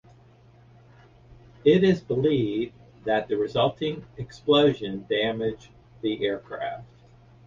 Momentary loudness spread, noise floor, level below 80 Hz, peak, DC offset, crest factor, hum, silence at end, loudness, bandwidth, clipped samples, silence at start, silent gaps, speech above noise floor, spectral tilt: 15 LU; -54 dBFS; -56 dBFS; -8 dBFS; under 0.1%; 18 dB; none; 0.6 s; -25 LUFS; 7.4 kHz; under 0.1%; 1.3 s; none; 30 dB; -7 dB/octave